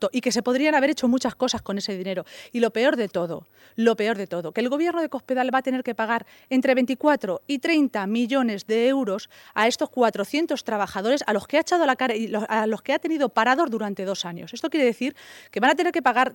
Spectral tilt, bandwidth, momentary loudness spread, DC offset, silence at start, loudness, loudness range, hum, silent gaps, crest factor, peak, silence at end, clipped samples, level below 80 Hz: -4 dB/octave; 17 kHz; 8 LU; under 0.1%; 0 s; -23 LUFS; 2 LU; none; none; 16 dB; -6 dBFS; 0 s; under 0.1%; -66 dBFS